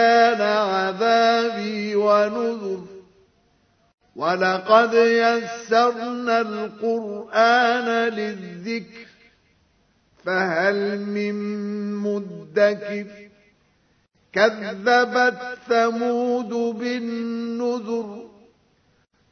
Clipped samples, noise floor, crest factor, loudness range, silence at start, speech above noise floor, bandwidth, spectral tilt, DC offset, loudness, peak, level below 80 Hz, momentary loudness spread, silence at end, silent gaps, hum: under 0.1%; -63 dBFS; 20 dB; 6 LU; 0 s; 42 dB; 6.6 kHz; -5 dB/octave; under 0.1%; -21 LUFS; -2 dBFS; -72 dBFS; 13 LU; 1.05 s; 3.94-3.98 s; none